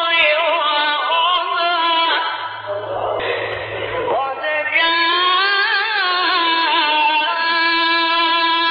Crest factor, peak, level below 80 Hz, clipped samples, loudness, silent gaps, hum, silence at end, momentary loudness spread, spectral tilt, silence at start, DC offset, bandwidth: 14 dB; -4 dBFS; -58 dBFS; under 0.1%; -16 LUFS; none; none; 0 s; 9 LU; 2 dB/octave; 0 s; under 0.1%; 5.2 kHz